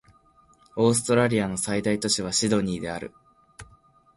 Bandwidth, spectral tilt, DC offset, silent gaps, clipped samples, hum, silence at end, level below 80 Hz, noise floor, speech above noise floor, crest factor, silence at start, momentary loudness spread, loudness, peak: 11.5 kHz; -4 dB/octave; under 0.1%; none; under 0.1%; none; 0.5 s; -54 dBFS; -59 dBFS; 35 dB; 18 dB; 0.75 s; 13 LU; -24 LUFS; -8 dBFS